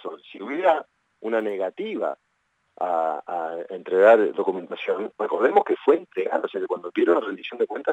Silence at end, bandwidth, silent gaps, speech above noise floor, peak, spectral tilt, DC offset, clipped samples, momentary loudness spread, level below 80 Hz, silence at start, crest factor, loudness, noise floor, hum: 0 s; 8 kHz; none; 48 dB; -4 dBFS; -6 dB/octave; under 0.1%; under 0.1%; 13 LU; -86 dBFS; 0.05 s; 20 dB; -23 LUFS; -71 dBFS; none